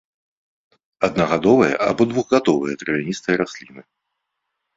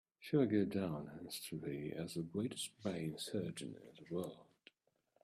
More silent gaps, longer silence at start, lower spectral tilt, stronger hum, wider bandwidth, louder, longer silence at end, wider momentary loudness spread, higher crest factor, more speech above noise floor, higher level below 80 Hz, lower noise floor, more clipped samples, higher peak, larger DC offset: neither; first, 1 s vs 0.2 s; about the same, -6 dB/octave vs -5.5 dB/octave; neither; second, 7.8 kHz vs 15.5 kHz; first, -19 LUFS vs -42 LUFS; first, 0.95 s vs 0.8 s; second, 8 LU vs 13 LU; about the same, 18 dB vs 20 dB; first, 59 dB vs 39 dB; first, -56 dBFS vs -76 dBFS; about the same, -77 dBFS vs -80 dBFS; neither; first, -2 dBFS vs -22 dBFS; neither